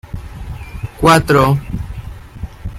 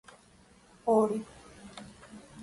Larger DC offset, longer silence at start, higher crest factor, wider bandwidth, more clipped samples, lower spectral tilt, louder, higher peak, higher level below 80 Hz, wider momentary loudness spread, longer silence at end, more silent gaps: neither; second, 0.05 s vs 0.85 s; about the same, 16 dB vs 20 dB; first, 16 kHz vs 11.5 kHz; neither; about the same, -6 dB/octave vs -6.5 dB/octave; first, -13 LUFS vs -29 LUFS; first, 0 dBFS vs -14 dBFS; first, -30 dBFS vs -66 dBFS; second, 21 LU vs 24 LU; about the same, 0 s vs 0 s; neither